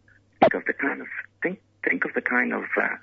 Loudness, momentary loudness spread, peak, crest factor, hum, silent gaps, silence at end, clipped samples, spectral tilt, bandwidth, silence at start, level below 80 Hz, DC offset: -25 LUFS; 9 LU; -4 dBFS; 22 dB; none; none; 0.05 s; under 0.1%; -7.5 dB/octave; 6.4 kHz; 0.4 s; -66 dBFS; under 0.1%